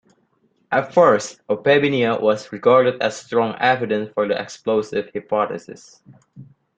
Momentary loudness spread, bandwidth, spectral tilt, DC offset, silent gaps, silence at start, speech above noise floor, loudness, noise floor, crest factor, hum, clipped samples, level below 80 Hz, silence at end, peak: 9 LU; 9 kHz; -5 dB/octave; under 0.1%; none; 0.7 s; 45 dB; -19 LUFS; -64 dBFS; 18 dB; none; under 0.1%; -64 dBFS; 0.35 s; -2 dBFS